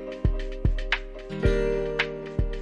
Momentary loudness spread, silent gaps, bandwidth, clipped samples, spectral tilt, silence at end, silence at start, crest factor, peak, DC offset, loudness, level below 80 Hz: 6 LU; none; 8.2 kHz; under 0.1%; -6.5 dB/octave; 0 s; 0 s; 18 dB; -8 dBFS; under 0.1%; -28 LUFS; -30 dBFS